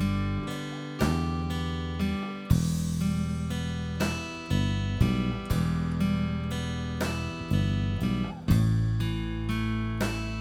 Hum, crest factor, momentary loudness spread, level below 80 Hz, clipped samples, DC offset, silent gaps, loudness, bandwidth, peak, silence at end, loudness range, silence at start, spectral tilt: none; 20 dB; 6 LU; -38 dBFS; under 0.1%; under 0.1%; none; -29 LUFS; 19.5 kHz; -8 dBFS; 0 s; 1 LU; 0 s; -6.5 dB/octave